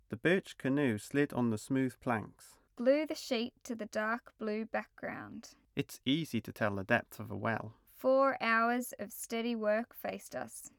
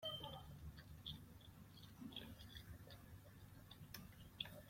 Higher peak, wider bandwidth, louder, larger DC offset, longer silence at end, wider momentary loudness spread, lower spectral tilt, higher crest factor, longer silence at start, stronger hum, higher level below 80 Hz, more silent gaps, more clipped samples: first, -16 dBFS vs -30 dBFS; first, over 20 kHz vs 16.5 kHz; first, -35 LUFS vs -57 LUFS; neither; about the same, 0.1 s vs 0 s; first, 13 LU vs 10 LU; about the same, -5.5 dB/octave vs -4.5 dB/octave; second, 18 dB vs 26 dB; about the same, 0.1 s vs 0 s; neither; about the same, -72 dBFS vs -68 dBFS; neither; neither